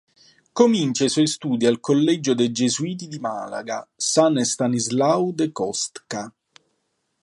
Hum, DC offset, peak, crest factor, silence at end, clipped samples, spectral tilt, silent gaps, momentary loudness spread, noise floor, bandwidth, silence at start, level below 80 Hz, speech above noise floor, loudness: none; under 0.1%; -2 dBFS; 20 dB; 0.95 s; under 0.1%; -4.5 dB/octave; none; 12 LU; -73 dBFS; 11.5 kHz; 0.55 s; -68 dBFS; 52 dB; -21 LUFS